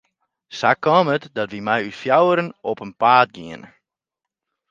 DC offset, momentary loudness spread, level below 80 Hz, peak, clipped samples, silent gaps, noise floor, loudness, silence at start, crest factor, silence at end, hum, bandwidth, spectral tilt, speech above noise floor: under 0.1%; 18 LU; -66 dBFS; 0 dBFS; under 0.1%; none; -86 dBFS; -19 LUFS; 0.5 s; 20 dB; 1.05 s; none; 7.6 kHz; -6 dB/octave; 67 dB